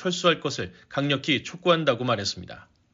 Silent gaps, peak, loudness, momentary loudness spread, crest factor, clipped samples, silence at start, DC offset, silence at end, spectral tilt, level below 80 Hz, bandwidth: none; -6 dBFS; -25 LUFS; 11 LU; 20 dB; under 0.1%; 0 s; under 0.1%; 0.35 s; -3 dB/octave; -62 dBFS; 7.8 kHz